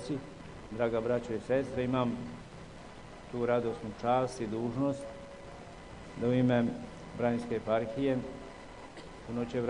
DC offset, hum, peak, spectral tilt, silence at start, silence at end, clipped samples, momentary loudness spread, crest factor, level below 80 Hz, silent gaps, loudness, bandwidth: under 0.1%; none; -14 dBFS; -7 dB/octave; 0 s; 0 s; under 0.1%; 18 LU; 18 dB; -56 dBFS; none; -33 LUFS; 10.5 kHz